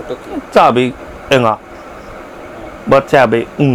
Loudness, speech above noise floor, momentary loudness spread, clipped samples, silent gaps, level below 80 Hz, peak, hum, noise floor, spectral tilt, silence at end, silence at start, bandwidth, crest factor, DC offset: -12 LUFS; 19 dB; 21 LU; 0.3%; none; -42 dBFS; 0 dBFS; none; -31 dBFS; -6 dB/octave; 0 s; 0 s; 15.5 kHz; 14 dB; under 0.1%